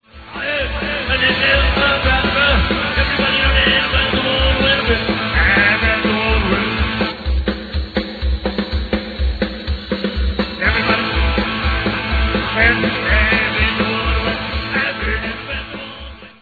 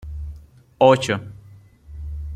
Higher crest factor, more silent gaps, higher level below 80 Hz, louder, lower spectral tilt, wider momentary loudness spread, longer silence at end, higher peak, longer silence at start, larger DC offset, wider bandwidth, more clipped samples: second, 16 dB vs 22 dB; neither; first, -22 dBFS vs -38 dBFS; about the same, -16 LUFS vs -18 LUFS; first, -7.5 dB/octave vs -5.5 dB/octave; second, 10 LU vs 22 LU; about the same, 0.1 s vs 0 s; about the same, 0 dBFS vs -2 dBFS; first, 0.15 s vs 0 s; neither; second, 4.8 kHz vs 10.5 kHz; neither